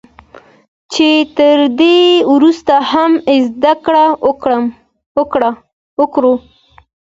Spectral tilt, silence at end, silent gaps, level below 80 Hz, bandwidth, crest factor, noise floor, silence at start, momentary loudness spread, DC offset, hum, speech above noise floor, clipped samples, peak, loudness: -4 dB/octave; 0.75 s; 5.06-5.15 s, 5.73-5.97 s; -52 dBFS; 7.8 kHz; 12 dB; -40 dBFS; 0.9 s; 10 LU; under 0.1%; none; 30 dB; under 0.1%; 0 dBFS; -11 LUFS